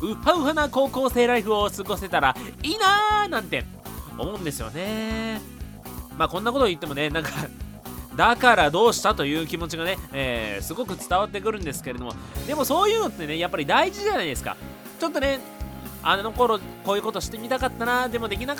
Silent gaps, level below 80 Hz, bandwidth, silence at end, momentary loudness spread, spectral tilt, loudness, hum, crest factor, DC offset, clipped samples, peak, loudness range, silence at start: none; -42 dBFS; over 20 kHz; 0 s; 15 LU; -4 dB/octave; -24 LUFS; none; 22 dB; under 0.1%; under 0.1%; -2 dBFS; 6 LU; 0 s